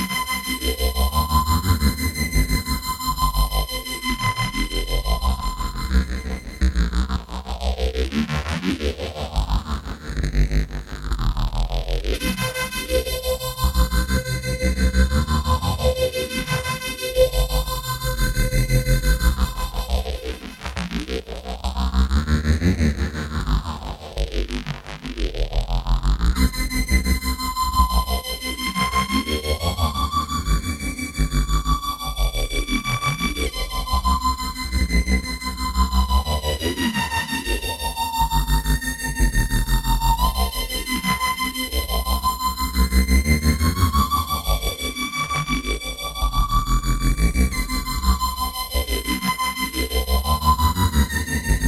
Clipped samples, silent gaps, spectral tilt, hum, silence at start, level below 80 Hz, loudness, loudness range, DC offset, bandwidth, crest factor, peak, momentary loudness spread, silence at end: under 0.1%; none; -4.5 dB/octave; none; 0 s; -24 dBFS; -23 LUFS; 4 LU; under 0.1%; 16.5 kHz; 18 dB; -4 dBFS; 7 LU; 0 s